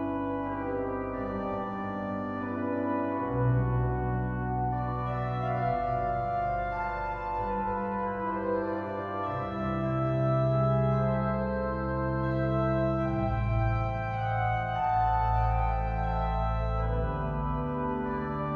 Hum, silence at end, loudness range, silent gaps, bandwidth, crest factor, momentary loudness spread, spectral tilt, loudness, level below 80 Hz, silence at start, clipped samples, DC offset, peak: none; 0 s; 3 LU; none; 5 kHz; 12 dB; 6 LU; -10 dB/octave; -30 LUFS; -38 dBFS; 0 s; under 0.1%; under 0.1%; -16 dBFS